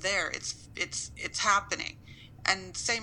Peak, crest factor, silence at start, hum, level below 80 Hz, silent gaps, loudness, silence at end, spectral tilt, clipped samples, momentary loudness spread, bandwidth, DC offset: -10 dBFS; 24 dB; 0 s; none; -56 dBFS; none; -31 LUFS; 0 s; -1 dB/octave; under 0.1%; 12 LU; 17 kHz; under 0.1%